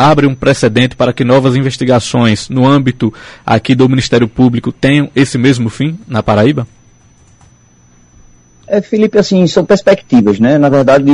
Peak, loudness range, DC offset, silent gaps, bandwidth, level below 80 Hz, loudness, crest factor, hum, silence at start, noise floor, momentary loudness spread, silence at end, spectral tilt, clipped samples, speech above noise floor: 0 dBFS; 5 LU; under 0.1%; none; 11 kHz; -40 dBFS; -10 LUFS; 10 dB; none; 0 s; -45 dBFS; 7 LU; 0 s; -6.5 dB/octave; under 0.1%; 36 dB